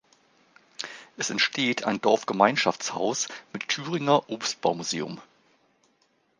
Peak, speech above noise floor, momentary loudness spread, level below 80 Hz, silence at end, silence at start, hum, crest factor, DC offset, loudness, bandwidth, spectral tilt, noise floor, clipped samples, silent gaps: -4 dBFS; 42 dB; 15 LU; -74 dBFS; 1.15 s; 0.8 s; none; 24 dB; under 0.1%; -26 LUFS; 10.5 kHz; -3 dB/octave; -68 dBFS; under 0.1%; none